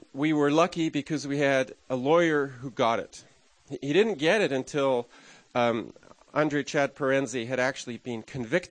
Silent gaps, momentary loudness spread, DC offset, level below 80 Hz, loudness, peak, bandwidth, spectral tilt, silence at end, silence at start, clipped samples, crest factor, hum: none; 12 LU; under 0.1%; -66 dBFS; -27 LUFS; -8 dBFS; 9.8 kHz; -5 dB/octave; 0.05 s; 0.15 s; under 0.1%; 18 dB; none